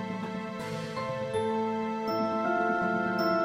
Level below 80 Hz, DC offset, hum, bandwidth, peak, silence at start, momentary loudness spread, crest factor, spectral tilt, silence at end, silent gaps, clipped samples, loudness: -64 dBFS; under 0.1%; none; 16 kHz; -16 dBFS; 0 s; 8 LU; 14 dB; -6.5 dB/octave; 0 s; none; under 0.1%; -30 LUFS